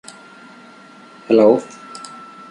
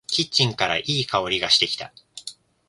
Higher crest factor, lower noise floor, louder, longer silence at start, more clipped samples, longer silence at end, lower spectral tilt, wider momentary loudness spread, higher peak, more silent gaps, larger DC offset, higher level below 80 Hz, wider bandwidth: about the same, 18 dB vs 22 dB; about the same, -43 dBFS vs -42 dBFS; first, -14 LUFS vs -20 LUFS; first, 1.3 s vs 0.1 s; neither; about the same, 0.45 s vs 0.35 s; first, -6 dB/octave vs -3 dB/octave; first, 24 LU vs 19 LU; about the same, -2 dBFS vs -2 dBFS; neither; neither; second, -66 dBFS vs -56 dBFS; about the same, 11 kHz vs 11.5 kHz